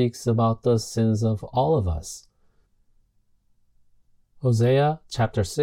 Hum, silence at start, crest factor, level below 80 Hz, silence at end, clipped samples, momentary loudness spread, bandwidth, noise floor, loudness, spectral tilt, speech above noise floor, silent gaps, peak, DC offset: none; 0 s; 16 dB; -46 dBFS; 0 s; under 0.1%; 9 LU; 14.5 kHz; -64 dBFS; -23 LUFS; -7 dB/octave; 42 dB; none; -10 dBFS; under 0.1%